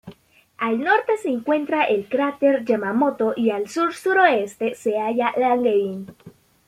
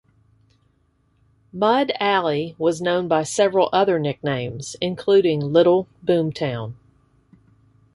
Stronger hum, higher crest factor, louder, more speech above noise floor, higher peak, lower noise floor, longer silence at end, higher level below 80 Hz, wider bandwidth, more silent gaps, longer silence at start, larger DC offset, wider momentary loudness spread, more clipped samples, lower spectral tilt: neither; about the same, 18 dB vs 18 dB; about the same, -21 LUFS vs -20 LUFS; second, 29 dB vs 44 dB; about the same, -2 dBFS vs -4 dBFS; second, -50 dBFS vs -63 dBFS; second, 0.4 s vs 1.2 s; second, -66 dBFS vs -60 dBFS; first, 14.5 kHz vs 11.5 kHz; neither; second, 0.05 s vs 1.55 s; neither; about the same, 7 LU vs 9 LU; neither; about the same, -5 dB/octave vs -5.5 dB/octave